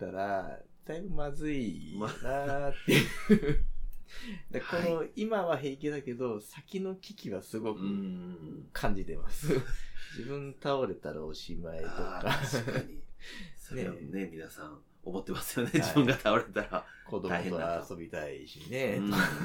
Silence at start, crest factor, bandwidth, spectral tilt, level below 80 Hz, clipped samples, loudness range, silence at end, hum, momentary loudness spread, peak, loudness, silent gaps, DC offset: 0 s; 22 dB; 18.5 kHz; -5.5 dB/octave; -42 dBFS; under 0.1%; 6 LU; 0 s; none; 18 LU; -10 dBFS; -34 LUFS; none; under 0.1%